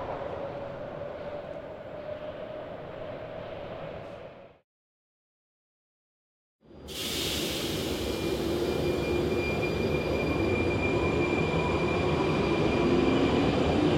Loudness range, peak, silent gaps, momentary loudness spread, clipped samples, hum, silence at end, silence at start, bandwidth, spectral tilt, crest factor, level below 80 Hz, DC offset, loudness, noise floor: 17 LU; -12 dBFS; 4.64-6.59 s; 15 LU; under 0.1%; none; 0 s; 0 s; 16.5 kHz; -5.5 dB/octave; 18 dB; -46 dBFS; under 0.1%; -29 LUFS; under -90 dBFS